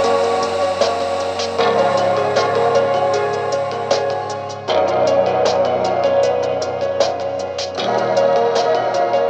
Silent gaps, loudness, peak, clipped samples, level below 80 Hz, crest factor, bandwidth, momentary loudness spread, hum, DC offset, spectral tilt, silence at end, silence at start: none; -17 LUFS; -2 dBFS; under 0.1%; -62 dBFS; 16 dB; 9 kHz; 6 LU; none; under 0.1%; -4 dB/octave; 0 s; 0 s